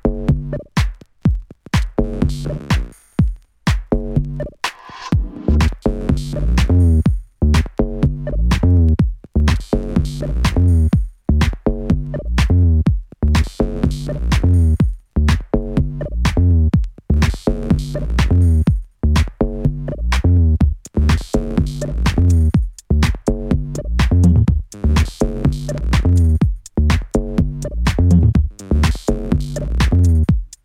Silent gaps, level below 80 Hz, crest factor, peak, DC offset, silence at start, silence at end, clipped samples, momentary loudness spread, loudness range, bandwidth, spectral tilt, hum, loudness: none; -20 dBFS; 14 dB; 0 dBFS; under 0.1%; 0.05 s; 0.15 s; under 0.1%; 8 LU; 4 LU; 12 kHz; -7 dB/octave; none; -18 LUFS